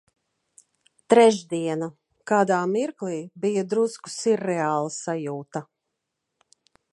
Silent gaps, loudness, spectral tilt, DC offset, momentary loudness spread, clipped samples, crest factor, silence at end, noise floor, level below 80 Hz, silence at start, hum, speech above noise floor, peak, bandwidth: none; -24 LUFS; -5 dB/octave; under 0.1%; 15 LU; under 0.1%; 22 dB; 1.3 s; -81 dBFS; -78 dBFS; 1.1 s; none; 58 dB; -4 dBFS; 11.5 kHz